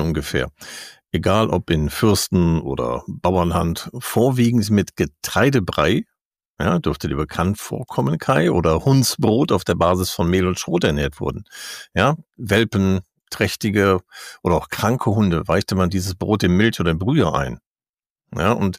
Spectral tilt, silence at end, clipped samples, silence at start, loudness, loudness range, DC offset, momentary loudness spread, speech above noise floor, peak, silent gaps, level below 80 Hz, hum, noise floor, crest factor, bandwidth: -5.5 dB/octave; 0 s; under 0.1%; 0 s; -19 LUFS; 2 LU; under 0.1%; 10 LU; over 71 dB; -4 dBFS; 6.21-6.31 s, 6.48-6.55 s, 17.66-17.75 s, 17.89-17.94 s, 18.06-18.16 s; -38 dBFS; none; under -90 dBFS; 16 dB; 15.5 kHz